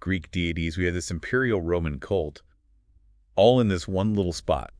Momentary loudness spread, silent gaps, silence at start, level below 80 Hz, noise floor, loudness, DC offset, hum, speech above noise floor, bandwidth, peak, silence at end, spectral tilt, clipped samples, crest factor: 9 LU; none; 0 s; -42 dBFS; -61 dBFS; -25 LUFS; under 0.1%; none; 36 dB; 10.5 kHz; -6 dBFS; 0.1 s; -6 dB/octave; under 0.1%; 20 dB